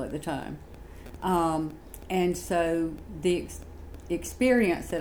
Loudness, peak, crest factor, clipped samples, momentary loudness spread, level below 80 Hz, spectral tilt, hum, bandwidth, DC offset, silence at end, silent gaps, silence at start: -28 LUFS; -12 dBFS; 16 dB; under 0.1%; 21 LU; -46 dBFS; -5.5 dB/octave; none; over 20 kHz; 0.1%; 0 s; none; 0 s